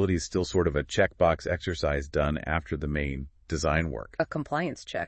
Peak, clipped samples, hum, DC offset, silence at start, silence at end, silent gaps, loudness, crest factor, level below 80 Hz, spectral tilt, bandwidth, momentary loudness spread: -10 dBFS; under 0.1%; none; under 0.1%; 0 s; 0 s; none; -28 LUFS; 18 dB; -42 dBFS; -5.5 dB/octave; 8.8 kHz; 7 LU